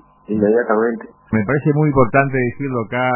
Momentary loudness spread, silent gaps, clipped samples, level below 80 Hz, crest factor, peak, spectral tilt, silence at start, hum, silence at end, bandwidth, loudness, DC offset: 8 LU; none; under 0.1%; -42 dBFS; 16 dB; 0 dBFS; -12 dB/octave; 0.3 s; none; 0 s; 3.1 kHz; -17 LUFS; under 0.1%